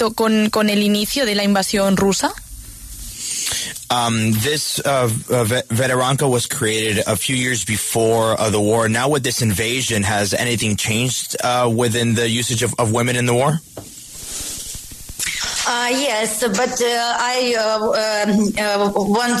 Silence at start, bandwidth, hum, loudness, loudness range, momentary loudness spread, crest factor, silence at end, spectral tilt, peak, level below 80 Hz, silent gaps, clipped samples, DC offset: 0 s; 14 kHz; none; -18 LUFS; 3 LU; 9 LU; 14 dB; 0 s; -4 dB/octave; -4 dBFS; -46 dBFS; none; under 0.1%; under 0.1%